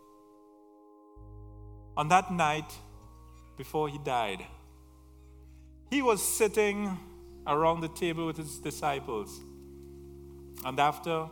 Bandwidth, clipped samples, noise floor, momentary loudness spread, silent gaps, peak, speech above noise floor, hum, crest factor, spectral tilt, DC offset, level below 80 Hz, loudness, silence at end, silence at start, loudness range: 18 kHz; under 0.1%; -57 dBFS; 23 LU; none; -10 dBFS; 27 dB; none; 24 dB; -4 dB/octave; under 0.1%; -54 dBFS; -30 LUFS; 0 s; 1.15 s; 5 LU